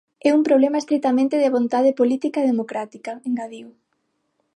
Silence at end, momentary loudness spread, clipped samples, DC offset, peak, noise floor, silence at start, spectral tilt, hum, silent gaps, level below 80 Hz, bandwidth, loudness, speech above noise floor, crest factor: 0.85 s; 13 LU; under 0.1%; under 0.1%; -4 dBFS; -71 dBFS; 0.25 s; -5.5 dB/octave; none; none; -78 dBFS; 11 kHz; -20 LUFS; 52 dB; 16 dB